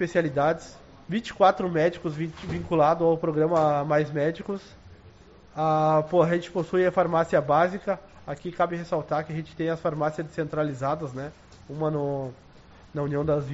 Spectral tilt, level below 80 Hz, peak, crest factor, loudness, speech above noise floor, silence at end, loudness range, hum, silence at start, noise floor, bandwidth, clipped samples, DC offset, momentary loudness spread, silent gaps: -6 dB/octave; -54 dBFS; -6 dBFS; 20 dB; -26 LUFS; 26 dB; 0 s; 6 LU; none; 0 s; -51 dBFS; 8 kHz; under 0.1%; under 0.1%; 13 LU; none